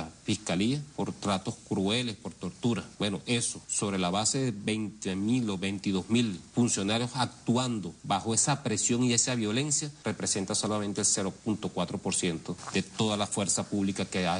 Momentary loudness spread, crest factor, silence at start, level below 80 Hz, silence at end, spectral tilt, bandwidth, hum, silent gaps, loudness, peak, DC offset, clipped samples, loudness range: 7 LU; 18 dB; 0 s; -62 dBFS; 0 s; -3.5 dB/octave; 11 kHz; none; none; -29 LUFS; -12 dBFS; under 0.1%; under 0.1%; 3 LU